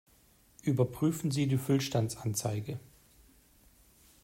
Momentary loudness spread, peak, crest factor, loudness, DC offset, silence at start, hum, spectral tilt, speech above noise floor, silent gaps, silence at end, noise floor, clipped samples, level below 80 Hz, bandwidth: 9 LU; -14 dBFS; 18 dB; -32 LUFS; under 0.1%; 0.65 s; none; -6 dB/octave; 33 dB; none; 1.45 s; -64 dBFS; under 0.1%; -64 dBFS; 16 kHz